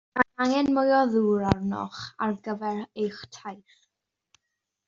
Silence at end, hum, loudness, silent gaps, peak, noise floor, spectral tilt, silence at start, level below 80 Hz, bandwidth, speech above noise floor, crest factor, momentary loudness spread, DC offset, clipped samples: 1.3 s; none; -26 LUFS; none; -2 dBFS; -83 dBFS; -5 dB/octave; 0.15 s; -56 dBFS; 7.6 kHz; 57 dB; 24 dB; 17 LU; under 0.1%; under 0.1%